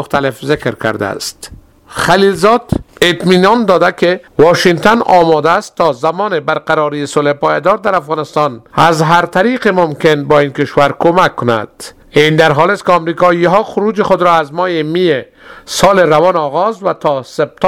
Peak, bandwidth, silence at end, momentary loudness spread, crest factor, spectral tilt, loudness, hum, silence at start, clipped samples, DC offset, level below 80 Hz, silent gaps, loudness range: 0 dBFS; 16.5 kHz; 0 s; 8 LU; 12 dB; -5 dB/octave; -11 LUFS; none; 0 s; 0.5%; 0.3%; -42 dBFS; none; 3 LU